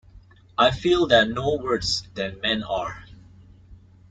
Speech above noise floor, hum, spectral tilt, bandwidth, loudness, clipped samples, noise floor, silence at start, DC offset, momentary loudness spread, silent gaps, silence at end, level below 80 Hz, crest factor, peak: 28 dB; none; -4.5 dB/octave; 9.2 kHz; -22 LUFS; under 0.1%; -50 dBFS; 0.15 s; under 0.1%; 14 LU; none; 0.35 s; -48 dBFS; 20 dB; -4 dBFS